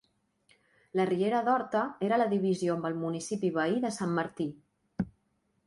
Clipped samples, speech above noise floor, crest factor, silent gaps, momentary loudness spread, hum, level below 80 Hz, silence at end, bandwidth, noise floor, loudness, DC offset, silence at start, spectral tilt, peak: under 0.1%; 45 dB; 16 dB; none; 10 LU; none; -66 dBFS; 0.6 s; 11.5 kHz; -75 dBFS; -31 LUFS; under 0.1%; 0.95 s; -6 dB/octave; -14 dBFS